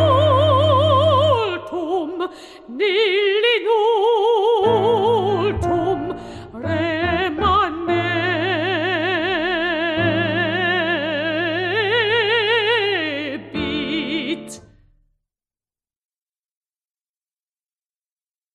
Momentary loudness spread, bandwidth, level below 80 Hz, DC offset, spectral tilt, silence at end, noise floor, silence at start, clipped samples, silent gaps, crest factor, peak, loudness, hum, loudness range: 11 LU; 11.5 kHz; -46 dBFS; under 0.1%; -6 dB/octave; 3.95 s; under -90 dBFS; 0 s; under 0.1%; none; 14 dB; -4 dBFS; -18 LUFS; none; 8 LU